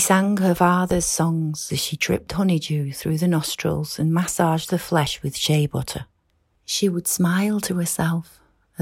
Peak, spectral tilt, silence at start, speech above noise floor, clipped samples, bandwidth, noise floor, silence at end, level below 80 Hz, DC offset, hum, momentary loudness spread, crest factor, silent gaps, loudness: -4 dBFS; -4.5 dB/octave; 0 s; 45 dB; under 0.1%; 16.5 kHz; -66 dBFS; 0 s; -48 dBFS; under 0.1%; none; 7 LU; 18 dB; none; -22 LUFS